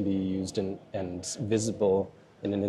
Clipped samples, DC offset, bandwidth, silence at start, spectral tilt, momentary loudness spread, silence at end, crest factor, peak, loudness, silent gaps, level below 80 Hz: under 0.1%; under 0.1%; 12.5 kHz; 0 s; -6 dB/octave; 9 LU; 0 s; 16 dB; -14 dBFS; -31 LUFS; none; -66 dBFS